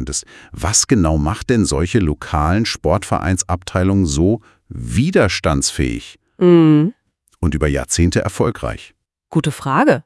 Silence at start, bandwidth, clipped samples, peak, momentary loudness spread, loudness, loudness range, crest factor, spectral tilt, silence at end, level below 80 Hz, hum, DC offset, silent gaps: 0 s; 12 kHz; under 0.1%; 0 dBFS; 11 LU; -16 LUFS; 2 LU; 16 dB; -5 dB/octave; 0.05 s; -32 dBFS; none; under 0.1%; none